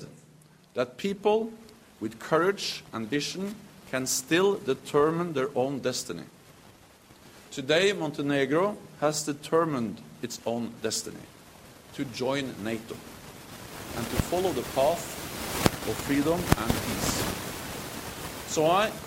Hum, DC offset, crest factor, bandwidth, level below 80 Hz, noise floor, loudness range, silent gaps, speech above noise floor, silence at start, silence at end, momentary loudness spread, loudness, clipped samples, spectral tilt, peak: none; under 0.1%; 28 dB; 16.5 kHz; -50 dBFS; -56 dBFS; 6 LU; none; 28 dB; 0 s; 0 s; 16 LU; -29 LUFS; under 0.1%; -4 dB/octave; 0 dBFS